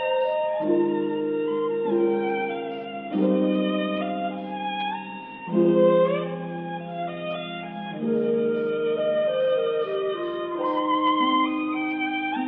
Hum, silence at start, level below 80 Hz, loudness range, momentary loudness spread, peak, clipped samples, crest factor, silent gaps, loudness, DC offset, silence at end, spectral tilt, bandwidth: none; 0 s; -72 dBFS; 2 LU; 11 LU; -8 dBFS; under 0.1%; 16 dB; none; -25 LUFS; under 0.1%; 0 s; -10 dB/octave; 4.2 kHz